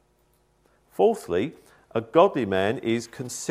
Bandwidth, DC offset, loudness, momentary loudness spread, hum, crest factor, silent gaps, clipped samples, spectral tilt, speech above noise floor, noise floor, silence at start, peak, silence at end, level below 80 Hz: 15.5 kHz; under 0.1%; -24 LUFS; 13 LU; none; 22 dB; none; under 0.1%; -5 dB/octave; 41 dB; -65 dBFS; 1 s; -4 dBFS; 0 s; -64 dBFS